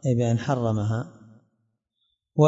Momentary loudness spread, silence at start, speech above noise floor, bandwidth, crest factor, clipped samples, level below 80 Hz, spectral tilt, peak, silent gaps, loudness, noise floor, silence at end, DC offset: 9 LU; 0.05 s; 51 dB; 7.8 kHz; 20 dB; under 0.1%; -58 dBFS; -8 dB/octave; -6 dBFS; none; -26 LUFS; -75 dBFS; 0 s; under 0.1%